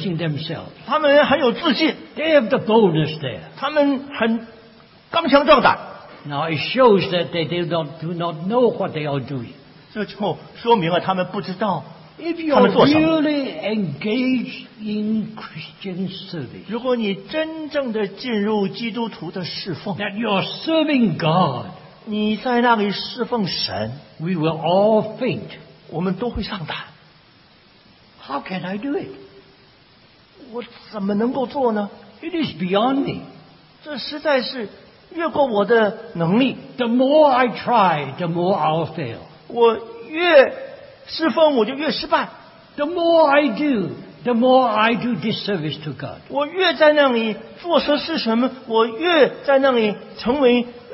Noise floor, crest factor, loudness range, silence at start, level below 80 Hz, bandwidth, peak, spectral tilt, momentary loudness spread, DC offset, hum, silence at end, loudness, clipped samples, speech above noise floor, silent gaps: -51 dBFS; 20 dB; 8 LU; 0 s; -54 dBFS; 5.8 kHz; 0 dBFS; -10 dB/octave; 16 LU; under 0.1%; none; 0 s; -19 LUFS; under 0.1%; 32 dB; none